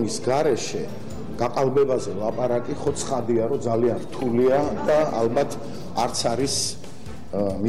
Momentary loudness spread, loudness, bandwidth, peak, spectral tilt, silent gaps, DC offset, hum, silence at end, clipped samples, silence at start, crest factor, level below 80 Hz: 11 LU; -23 LUFS; 15.5 kHz; -10 dBFS; -5 dB/octave; none; 2%; none; 0 s; under 0.1%; 0 s; 12 dB; -48 dBFS